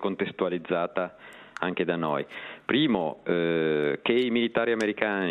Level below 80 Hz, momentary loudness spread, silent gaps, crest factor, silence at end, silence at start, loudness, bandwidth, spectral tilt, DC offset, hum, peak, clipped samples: -68 dBFS; 9 LU; none; 22 dB; 0 s; 0 s; -27 LUFS; 10 kHz; -6 dB/octave; under 0.1%; none; -6 dBFS; under 0.1%